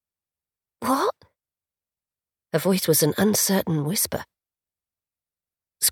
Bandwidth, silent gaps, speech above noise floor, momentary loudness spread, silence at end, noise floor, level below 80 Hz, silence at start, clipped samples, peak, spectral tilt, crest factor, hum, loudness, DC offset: 19.5 kHz; none; over 68 dB; 9 LU; 0 s; under -90 dBFS; -62 dBFS; 0.8 s; under 0.1%; -6 dBFS; -4 dB/octave; 20 dB; none; -22 LUFS; under 0.1%